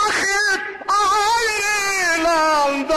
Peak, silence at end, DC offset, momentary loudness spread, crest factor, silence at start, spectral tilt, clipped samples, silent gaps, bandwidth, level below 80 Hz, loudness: -8 dBFS; 0 s; under 0.1%; 3 LU; 10 dB; 0 s; -0.5 dB/octave; under 0.1%; none; 13.5 kHz; -48 dBFS; -17 LUFS